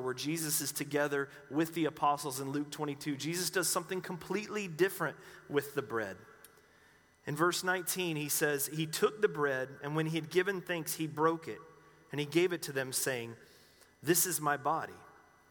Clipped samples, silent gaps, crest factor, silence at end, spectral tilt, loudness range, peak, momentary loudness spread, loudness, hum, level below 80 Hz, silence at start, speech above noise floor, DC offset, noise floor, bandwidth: under 0.1%; none; 20 dB; 0.4 s; -3.5 dB/octave; 3 LU; -14 dBFS; 9 LU; -34 LUFS; none; -76 dBFS; 0 s; 30 dB; under 0.1%; -64 dBFS; over 20 kHz